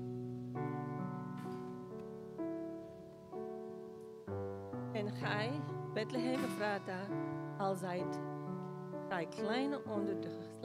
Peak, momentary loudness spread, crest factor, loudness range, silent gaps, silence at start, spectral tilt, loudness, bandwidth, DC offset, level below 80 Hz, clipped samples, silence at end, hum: -22 dBFS; 11 LU; 18 dB; 7 LU; none; 0 s; -6.5 dB/octave; -41 LUFS; 15.5 kHz; under 0.1%; -76 dBFS; under 0.1%; 0 s; none